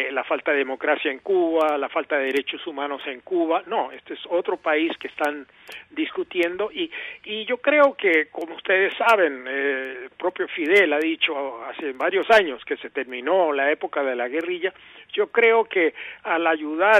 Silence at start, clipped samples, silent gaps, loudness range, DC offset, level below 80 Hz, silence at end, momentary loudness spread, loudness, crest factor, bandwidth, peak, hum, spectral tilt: 0 s; under 0.1%; none; 5 LU; under 0.1%; -70 dBFS; 0 s; 13 LU; -22 LUFS; 18 dB; 15.5 kHz; -4 dBFS; none; -4 dB/octave